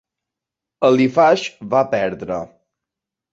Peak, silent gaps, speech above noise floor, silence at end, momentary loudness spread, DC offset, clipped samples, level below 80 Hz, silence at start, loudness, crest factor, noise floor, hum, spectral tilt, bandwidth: -2 dBFS; none; 69 dB; 0.85 s; 13 LU; under 0.1%; under 0.1%; -58 dBFS; 0.8 s; -17 LUFS; 18 dB; -85 dBFS; none; -6 dB/octave; 7.8 kHz